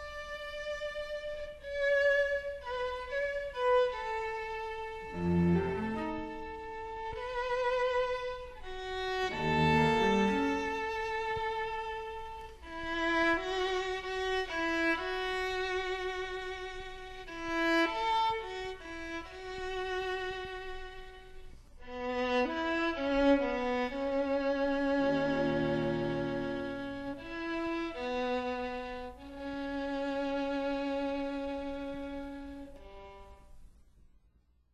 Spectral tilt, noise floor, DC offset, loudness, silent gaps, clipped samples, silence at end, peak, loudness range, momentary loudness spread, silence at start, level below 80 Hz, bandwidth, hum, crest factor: -6 dB/octave; -67 dBFS; under 0.1%; -33 LUFS; none; under 0.1%; 1 s; -16 dBFS; 6 LU; 14 LU; 0 s; -52 dBFS; 13 kHz; none; 18 dB